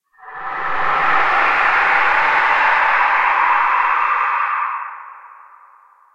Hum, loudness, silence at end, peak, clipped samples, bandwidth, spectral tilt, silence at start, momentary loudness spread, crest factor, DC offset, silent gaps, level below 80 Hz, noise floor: none; -15 LUFS; 0.5 s; -2 dBFS; under 0.1%; 9.2 kHz; -2.5 dB/octave; 0.2 s; 13 LU; 16 dB; under 0.1%; none; -50 dBFS; -49 dBFS